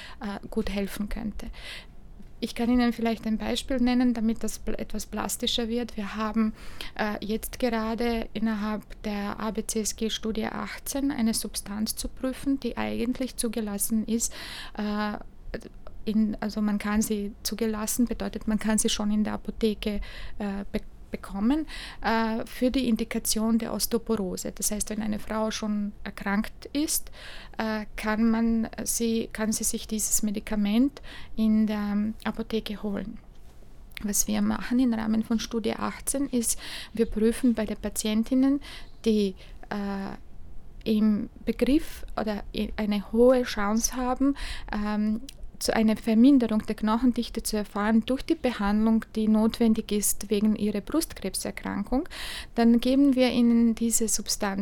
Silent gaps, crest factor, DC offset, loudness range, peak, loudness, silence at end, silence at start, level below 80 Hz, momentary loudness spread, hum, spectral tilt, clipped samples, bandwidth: none; 18 dB; under 0.1%; 5 LU; -10 dBFS; -27 LUFS; 0 s; 0 s; -42 dBFS; 11 LU; none; -4 dB/octave; under 0.1%; 19.5 kHz